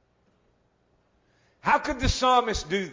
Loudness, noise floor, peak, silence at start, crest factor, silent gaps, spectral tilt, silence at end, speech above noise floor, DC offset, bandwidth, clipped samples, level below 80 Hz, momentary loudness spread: -24 LUFS; -67 dBFS; -8 dBFS; 1.65 s; 20 dB; none; -4 dB/octave; 0 s; 43 dB; under 0.1%; 7.6 kHz; under 0.1%; -40 dBFS; 7 LU